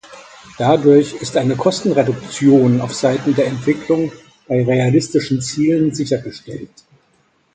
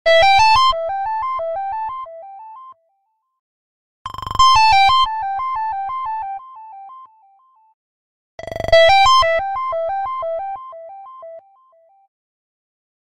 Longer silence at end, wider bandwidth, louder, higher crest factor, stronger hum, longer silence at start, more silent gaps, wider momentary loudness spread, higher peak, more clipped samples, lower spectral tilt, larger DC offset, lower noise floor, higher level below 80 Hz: about the same, 0.9 s vs 1 s; second, 9.4 kHz vs 14.5 kHz; about the same, -16 LUFS vs -15 LUFS; about the same, 16 dB vs 18 dB; neither; about the same, 0.1 s vs 0.05 s; second, none vs 3.39-4.05 s, 7.74-8.38 s; second, 9 LU vs 26 LU; about the same, 0 dBFS vs -2 dBFS; neither; first, -6.5 dB/octave vs -1.5 dB/octave; neither; second, -59 dBFS vs -68 dBFS; second, -54 dBFS vs -42 dBFS